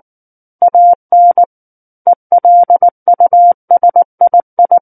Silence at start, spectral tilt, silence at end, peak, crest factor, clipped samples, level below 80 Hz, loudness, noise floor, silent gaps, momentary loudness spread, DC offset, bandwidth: 0.6 s; -10 dB/octave; 0.05 s; 0 dBFS; 8 dB; under 0.1%; -66 dBFS; -9 LUFS; under -90 dBFS; 0.95-1.09 s, 1.46-2.05 s, 2.16-2.30 s, 2.91-3.06 s, 3.54-3.68 s, 4.05-4.18 s, 4.43-4.57 s; 6 LU; under 0.1%; 1.8 kHz